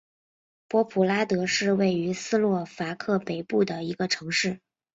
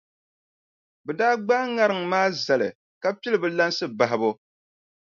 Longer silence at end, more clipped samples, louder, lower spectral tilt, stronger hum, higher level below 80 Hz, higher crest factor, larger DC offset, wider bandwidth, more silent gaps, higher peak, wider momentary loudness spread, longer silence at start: second, 0.35 s vs 0.8 s; neither; second, -26 LUFS vs -23 LUFS; about the same, -4.5 dB/octave vs -4.5 dB/octave; neither; first, -68 dBFS vs -76 dBFS; about the same, 16 dB vs 20 dB; neither; about the same, 8 kHz vs 7.4 kHz; second, none vs 2.75-3.01 s; second, -10 dBFS vs -6 dBFS; about the same, 7 LU vs 8 LU; second, 0.7 s vs 1.05 s